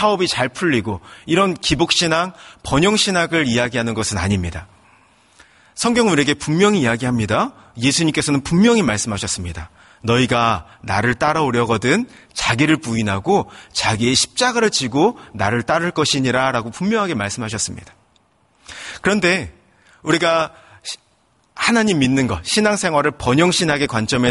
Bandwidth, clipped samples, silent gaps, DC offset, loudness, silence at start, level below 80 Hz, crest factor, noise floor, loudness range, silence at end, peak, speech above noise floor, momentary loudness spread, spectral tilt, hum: 11.5 kHz; under 0.1%; none; under 0.1%; -17 LUFS; 0 s; -44 dBFS; 16 dB; -59 dBFS; 4 LU; 0 s; -2 dBFS; 42 dB; 11 LU; -4 dB/octave; none